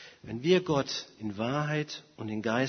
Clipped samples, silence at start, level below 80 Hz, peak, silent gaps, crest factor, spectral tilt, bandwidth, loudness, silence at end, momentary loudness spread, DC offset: under 0.1%; 0 s; -64 dBFS; -10 dBFS; none; 20 dB; -5.5 dB/octave; 6.6 kHz; -31 LUFS; 0 s; 13 LU; under 0.1%